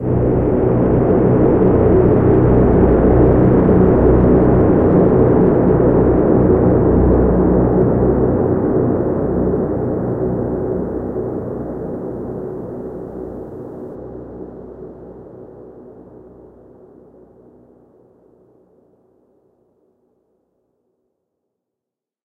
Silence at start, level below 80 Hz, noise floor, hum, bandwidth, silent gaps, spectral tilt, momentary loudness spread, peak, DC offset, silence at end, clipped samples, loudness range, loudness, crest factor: 0 s; -26 dBFS; -85 dBFS; none; 3.3 kHz; none; -13 dB/octave; 19 LU; 0 dBFS; under 0.1%; 6.35 s; under 0.1%; 20 LU; -14 LUFS; 14 dB